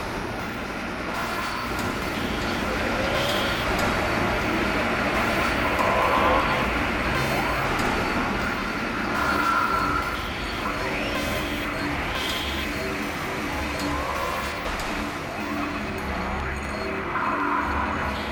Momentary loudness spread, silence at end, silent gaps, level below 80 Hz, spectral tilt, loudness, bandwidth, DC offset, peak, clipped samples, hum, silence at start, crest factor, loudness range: 7 LU; 0 s; none; -38 dBFS; -4.5 dB/octave; -25 LUFS; 19 kHz; under 0.1%; -8 dBFS; under 0.1%; none; 0 s; 18 dB; 5 LU